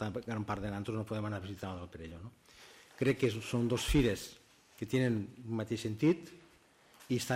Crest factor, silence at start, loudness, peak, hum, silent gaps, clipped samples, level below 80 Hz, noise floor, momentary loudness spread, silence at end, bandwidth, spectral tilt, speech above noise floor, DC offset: 18 dB; 0 s; -35 LUFS; -16 dBFS; none; none; under 0.1%; -50 dBFS; -64 dBFS; 18 LU; 0 s; 16 kHz; -6 dB/octave; 29 dB; under 0.1%